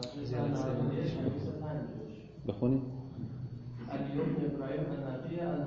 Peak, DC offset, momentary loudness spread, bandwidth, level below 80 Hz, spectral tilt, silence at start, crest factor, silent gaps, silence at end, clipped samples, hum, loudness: -18 dBFS; under 0.1%; 10 LU; 7.6 kHz; -58 dBFS; -8 dB/octave; 0 s; 18 dB; none; 0 s; under 0.1%; none; -36 LUFS